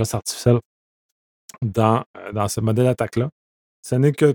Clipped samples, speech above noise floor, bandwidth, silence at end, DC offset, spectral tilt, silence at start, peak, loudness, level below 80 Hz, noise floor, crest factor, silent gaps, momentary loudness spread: under 0.1%; over 71 dB; 18.5 kHz; 0 s; under 0.1%; -6.5 dB/octave; 0 s; -2 dBFS; -21 LUFS; -52 dBFS; under -90 dBFS; 20 dB; 0.65-1.49 s, 2.06-2.14 s, 3.32-3.83 s; 10 LU